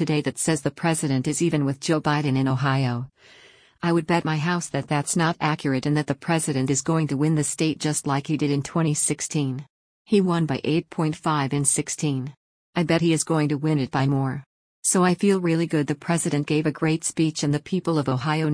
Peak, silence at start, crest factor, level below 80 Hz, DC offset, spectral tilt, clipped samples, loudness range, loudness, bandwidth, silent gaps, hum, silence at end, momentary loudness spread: -8 dBFS; 0 s; 16 dB; -58 dBFS; under 0.1%; -5 dB/octave; under 0.1%; 2 LU; -23 LUFS; 10.5 kHz; 9.70-10.05 s, 12.37-12.73 s, 14.46-14.83 s; none; 0 s; 5 LU